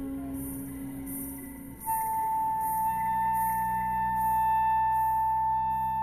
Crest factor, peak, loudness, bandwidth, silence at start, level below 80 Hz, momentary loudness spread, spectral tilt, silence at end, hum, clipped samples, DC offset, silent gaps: 8 dB; -20 dBFS; -29 LUFS; 15 kHz; 0 s; -50 dBFS; 12 LU; -5 dB/octave; 0 s; none; under 0.1%; under 0.1%; none